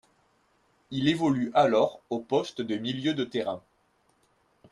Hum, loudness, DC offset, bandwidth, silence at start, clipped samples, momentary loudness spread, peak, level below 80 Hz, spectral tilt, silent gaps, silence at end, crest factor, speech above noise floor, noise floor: none; -27 LUFS; under 0.1%; 11.5 kHz; 0.9 s; under 0.1%; 12 LU; -10 dBFS; -68 dBFS; -6 dB/octave; none; 1.15 s; 20 dB; 42 dB; -68 dBFS